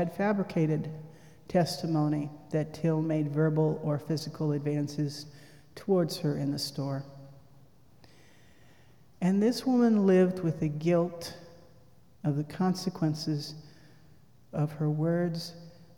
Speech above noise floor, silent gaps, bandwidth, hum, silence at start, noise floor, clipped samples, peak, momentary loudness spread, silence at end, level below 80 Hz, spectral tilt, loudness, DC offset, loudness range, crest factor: 31 dB; none; 17.5 kHz; none; 0 s; -60 dBFS; under 0.1%; -14 dBFS; 16 LU; 0.25 s; -66 dBFS; -7 dB/octave; -29 LUFS; 0.1%; 6 LU; 16 dB